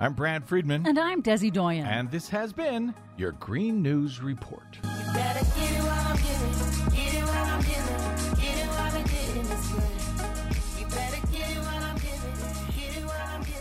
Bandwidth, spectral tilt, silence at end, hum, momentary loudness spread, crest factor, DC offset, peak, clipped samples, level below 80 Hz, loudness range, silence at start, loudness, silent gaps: 16 kHz; -5 dB/octave; 0 s; none; 8 LU; 16 dB; under 0.1%; -10 dBFS; under 0.1%; -32 dBFS; 4 LU; 0 s; -29 LUFS; none